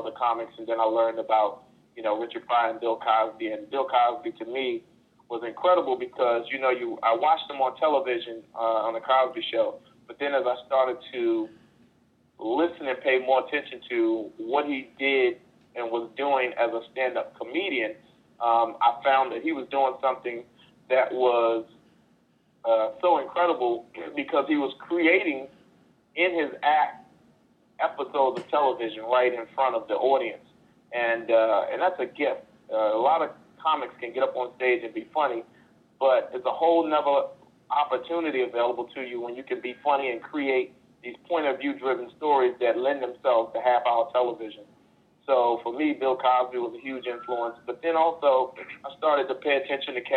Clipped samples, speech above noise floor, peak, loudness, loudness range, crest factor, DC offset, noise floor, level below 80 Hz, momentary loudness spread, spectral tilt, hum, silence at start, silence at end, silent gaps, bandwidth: under 0.1%; 39 dB; -8 dBFS; -26 LUFS; 2 LU; 18 dB; under 0.1%; -64 dBFS; -76 dBFS; 11 LU; -6 dB/octave; none; 0 s; 0 s; none; 5 kHz